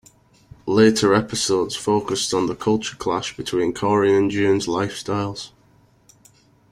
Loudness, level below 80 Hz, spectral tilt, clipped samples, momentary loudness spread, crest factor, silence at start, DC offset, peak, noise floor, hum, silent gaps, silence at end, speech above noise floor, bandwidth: -20 LUFS; -54 dBFS; -4.5 dB/octave; under 0.1%; 9 LU; 20 dB; 0.65 s; under 0.1%; -2 dBFS; -56 dBFS; none; none; 1.25 s; 36 dB; 15 kHz